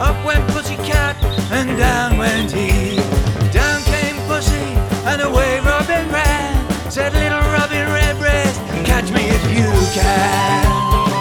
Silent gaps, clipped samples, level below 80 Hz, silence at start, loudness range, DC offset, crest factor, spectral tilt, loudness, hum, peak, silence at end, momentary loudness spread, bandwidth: none; under 0.1%; -20 dBFS; 0 s; 2 LU; under 0.1%; 16 dB; -5 dB/octave; -16 LUFS; none; 0 dBFS; 0 s; 4 LU; 19.5 kHz